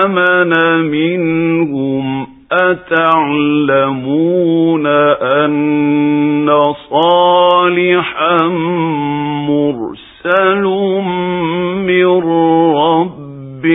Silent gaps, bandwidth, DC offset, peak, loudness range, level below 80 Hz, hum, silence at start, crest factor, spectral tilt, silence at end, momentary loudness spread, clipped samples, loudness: none; 4 kHz; under 0.1%; 0 dBFS; 3 LU; -54 dBFS; none; 0 s; 12 dB; -9.5 dB/octave; 0 s; 7 LU; under 0.1%; -12 LUFS